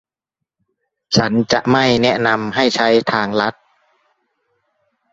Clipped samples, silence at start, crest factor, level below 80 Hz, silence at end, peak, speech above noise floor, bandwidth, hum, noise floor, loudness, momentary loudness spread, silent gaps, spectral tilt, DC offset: under 0.1%; 1.1 s; 18 dB; -52 dBFS; 1.6 s; 0 dBFS; 67 dB; 8 kHz; none; -82 dBFS; -15 LUFS; 5 LU; none; -4.5 dB/octave; under 0.1%